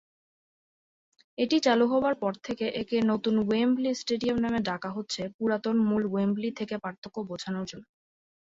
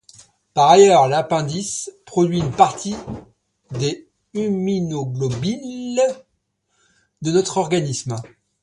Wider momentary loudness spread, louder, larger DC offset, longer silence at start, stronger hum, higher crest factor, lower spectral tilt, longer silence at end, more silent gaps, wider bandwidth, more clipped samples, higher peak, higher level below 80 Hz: second, 12 LU vs 18 LU; second, -28 LUFS vs -19 LUFS; neither; first, 1.4 s vs 0.55 s; neither; about the same, 18 dB vs 20 dB; about the same, -5.5 dB/octave vs -5 dB/octave; first, 0.6 s vs 0.4 s; first, 5.34-5.39 s, 6.98-7.02 s vs none; second, 8 kHz vs 11.5 kHz; neither; second, -10 dBFS vs 0 dBFS; second, -64 dBFS vs -52 dBFS